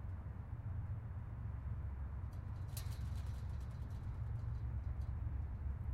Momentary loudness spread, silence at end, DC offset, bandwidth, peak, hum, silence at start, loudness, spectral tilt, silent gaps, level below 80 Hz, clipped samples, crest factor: 3 LU; 0 s; under 0.1%; 15.5 kHz; -32 dBFS; none; 0 s; -46 LUFS; -7 dB/octave; none; -46 dBFS; under 0.1%; 12 dB